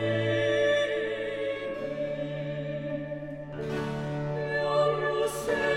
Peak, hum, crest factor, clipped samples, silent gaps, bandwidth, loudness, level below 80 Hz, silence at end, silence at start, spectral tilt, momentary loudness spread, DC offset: -14 dBFS; none; 14 dB; under 0.1%; none; 16 kHz; -30 LUFS; -56 dBFS; 0 s; 0 s; -5.5 dB/octave; 9 LU; under 0.1%